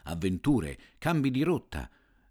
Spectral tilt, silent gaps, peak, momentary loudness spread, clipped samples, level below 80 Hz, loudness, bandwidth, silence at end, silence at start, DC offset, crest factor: -7 dB/octave; none; -14 dBFS; 14 LU; under 0.1%; -48 dBFS; -30 LUFS; 18 kHz; 0.45 s; 0.05 s; under 0.1%; 16 dB